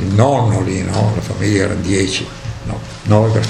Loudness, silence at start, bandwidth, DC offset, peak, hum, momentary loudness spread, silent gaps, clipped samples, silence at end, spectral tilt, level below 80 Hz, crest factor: -16 LUFS; 0 s; 11 kHz; under 0.1%; 0 dBFS; none; 13 LU; none; under 0.1%; 0 s; -6 dB/octave; -36 dBFS; 16 dB